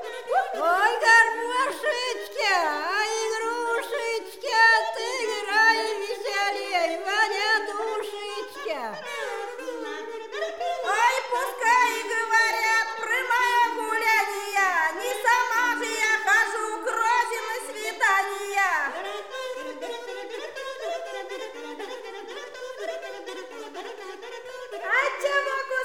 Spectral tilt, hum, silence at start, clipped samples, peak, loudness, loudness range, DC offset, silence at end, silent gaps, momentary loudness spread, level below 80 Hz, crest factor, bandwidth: 0.5 dB/octave; none; 0 s; under 0.1%; -6 dBFS; -24 LUFS; 13 LU; 0.2%; 0 s; none; 16 LU; -74 dBFS; 18 dB; 17.5 kHz